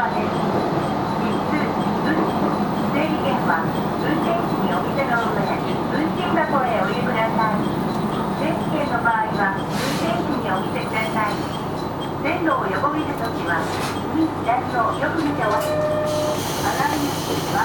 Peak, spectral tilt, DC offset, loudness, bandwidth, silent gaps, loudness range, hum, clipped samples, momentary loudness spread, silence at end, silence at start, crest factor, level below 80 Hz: -6 dBFS; -5.5 dB/octave; under 0.1%; -21 LUFS; over 20 kHz; none; 2 LU; none; under 0.1%; 3 LU; 0 s; 0 s; 14 dB; -46 dBFS